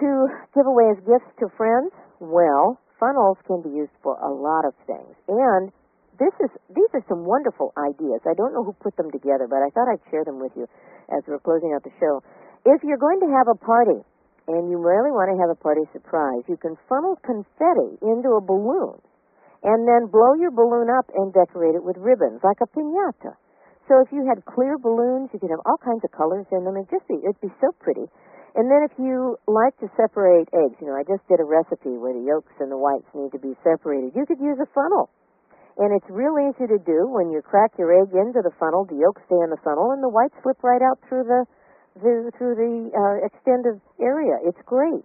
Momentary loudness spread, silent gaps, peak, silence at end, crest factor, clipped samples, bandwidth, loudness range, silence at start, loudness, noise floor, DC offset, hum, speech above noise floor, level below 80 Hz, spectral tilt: 10 LU; none; -4 dBFS; 0.05 s; 18 dB; under 0.1%; 2.7 kHz; 5 LU; 0 s; -21 LUFS; -56 dBFS; under 0.1%; none; 36 dB; -70 dBFS; -2 dB/octave